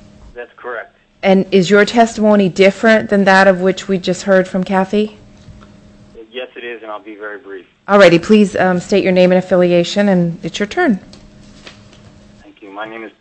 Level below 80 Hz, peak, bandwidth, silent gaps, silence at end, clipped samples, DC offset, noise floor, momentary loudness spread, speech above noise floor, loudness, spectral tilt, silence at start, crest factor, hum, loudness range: -48 dBFS; 0 dBFS; 8.6 kHz; none; 0.1 s; under 0.1%; under 0.1%; -42 dBFS; 20 LU; 30 dB; -12 LUFS; -6 dB/octave; 0.35 s; 14 dB; none; 8 LU